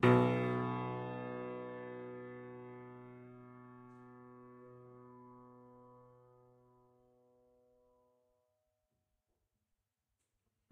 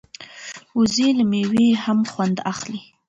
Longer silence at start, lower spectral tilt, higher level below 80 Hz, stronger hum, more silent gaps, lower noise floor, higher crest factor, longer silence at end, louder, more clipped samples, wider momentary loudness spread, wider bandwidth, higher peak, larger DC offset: second, 0 s vs 0.2 s; first, -8.5 dB/octave vs -5 dB/octave; second, -76 dBFS vs -58 dBFS; neither; neither; first, -88 dBFS vs -39 dBFS; first, 26 dB vs 12 dB; first, 4.75 s vs 0.25 s; second, -38 LUFS vs -20 LUFS; neither; first, 23 LU vs 18 LU; about the same, 8.8 kHz vs 8.2 kHz; second, -14 dBFS vs -8 dBFS; neither